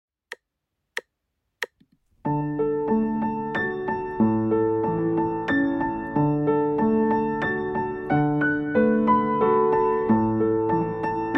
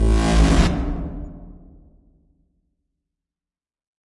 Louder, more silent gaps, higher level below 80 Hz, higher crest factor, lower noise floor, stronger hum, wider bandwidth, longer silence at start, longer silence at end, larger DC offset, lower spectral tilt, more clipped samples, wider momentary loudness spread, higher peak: second, -23 LUFS vs -20 LUFS; neither; second, -52 dBFS vs -24 dBFS; about the same, 16 dB vs 18 dB; second, -81 dBFS vs under -90 dBFS; neither; second, 10 kHz vs 11.5 kHz; first, 0.3 s vs 0 s; second, 0 s vs 2.55 s; neither; first, -8.5 dB/octave vs -6 dB/octave; neither; second, 14 LU vs 21 LU; second, -8 dBFS vs -4 dBFS